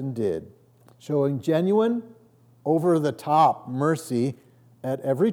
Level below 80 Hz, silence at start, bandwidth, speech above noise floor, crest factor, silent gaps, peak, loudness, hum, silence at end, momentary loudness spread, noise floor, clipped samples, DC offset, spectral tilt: -72 dBFS; 0 s; 18 kHz; 33 dB; 16 dB; none; -8 dBFS; -24 LUFS; none; 0 s; 12 LU; -56 dBFS; under 0.1%; under 0.1%; -7.5 dB/octave